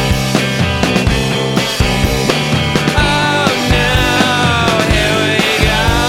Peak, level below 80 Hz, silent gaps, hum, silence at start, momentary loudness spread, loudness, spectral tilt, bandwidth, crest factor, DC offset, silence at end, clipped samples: 0 dBFS; -22 dBFS; none; none; 0 s; 3 LU; -12 LUFS; -4.5 dB/octave; 16.5 kHz; 12 dB; under 0.1%; 0 s; under 0.1%